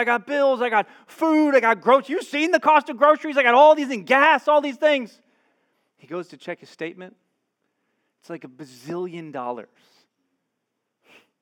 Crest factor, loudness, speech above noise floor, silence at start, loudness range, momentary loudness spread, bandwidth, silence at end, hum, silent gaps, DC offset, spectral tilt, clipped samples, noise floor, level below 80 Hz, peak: 20 dB; -18 LUFS; 58 dB; 0 s; 20 LU; 20 LU; 13 kHz; 1.8 s; none; none; under 0.1%; -4.5 dB/octave; under 0.1%; -78 dBFS; under -90 dBFS; -2 dBFS